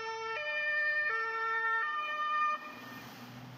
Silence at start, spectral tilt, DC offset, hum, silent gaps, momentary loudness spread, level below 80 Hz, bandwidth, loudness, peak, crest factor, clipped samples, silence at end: 0 s; -3 dB/octave; under 0.1%; none; none; 17 LU; -82 dBFS; 15.5 kHz; -32 LUFS; -22 dBFS; 14 dB; under 0.1%; 0 s